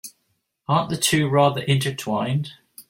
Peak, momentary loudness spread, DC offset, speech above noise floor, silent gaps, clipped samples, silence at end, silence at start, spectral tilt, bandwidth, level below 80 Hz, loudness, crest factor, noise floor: -4 dBFS; 15 LU; under 0.1%; 51 dB; none; under 0.1%; 0.1 s; 0.05 s; -4.5 dB/octave; 16.5 kHz; -60 dBFS; -21 LUFS; 18 dB; -72 dBFS